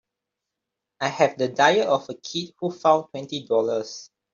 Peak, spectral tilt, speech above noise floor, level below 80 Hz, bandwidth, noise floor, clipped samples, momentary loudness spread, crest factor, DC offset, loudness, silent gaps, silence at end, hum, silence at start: -4 dBFS; -4 dB/octave; 62 dB; -72 dBFS; 7.6 kHz; -84 dBFS; under 0.1%; 13 LU; 20 dB; under 0.1%; -23 LUFS; none; 0.3 s; none; 1 s